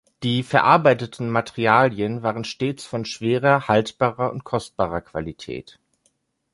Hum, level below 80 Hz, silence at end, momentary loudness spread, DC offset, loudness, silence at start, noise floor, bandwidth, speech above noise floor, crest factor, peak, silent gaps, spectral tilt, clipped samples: none; -52 dBFS; 0.95 s; 14 LU; under 0.1%; -21 LUFS; 0.2 s; -68 dBFS; 11.5 kHz; 47 dB; 20 dB; -2 dBFS; none; -6 dB/octave; under 0.1%